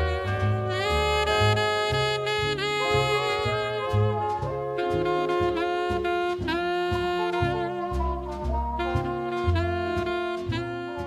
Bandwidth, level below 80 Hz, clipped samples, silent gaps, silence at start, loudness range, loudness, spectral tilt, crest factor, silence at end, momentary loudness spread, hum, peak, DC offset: 14.5 kHz; -36 dBFS; under 0.1%; none; 0 s; 4 LU; -26 LUFS; -5.5 dB/octave; 18 dB; 0 s; 6 LU; none; -8 dBFS; under 0.1%